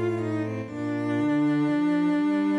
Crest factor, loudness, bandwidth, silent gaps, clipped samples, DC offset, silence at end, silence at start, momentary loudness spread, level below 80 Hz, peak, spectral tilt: 8 dB; -25 LUFS; 8.4 kHz; none; under 0.1%; under 0.1%; 0 s; 0 s; 7 LU; -68 dBFS; -16 dBFS; -8 dB/octave